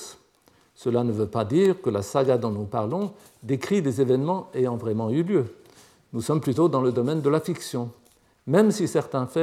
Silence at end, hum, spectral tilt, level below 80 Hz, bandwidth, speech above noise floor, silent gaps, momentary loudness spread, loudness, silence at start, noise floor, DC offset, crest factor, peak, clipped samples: 0 s; none; -7 dB/octave; -68 dBFS; 15 kHz; 37 dB; none; 11 LU; -24 LUFS; 0 s; -60 dBFS; under 0.1%; 18 dB; -6 dBFS; under 0.1%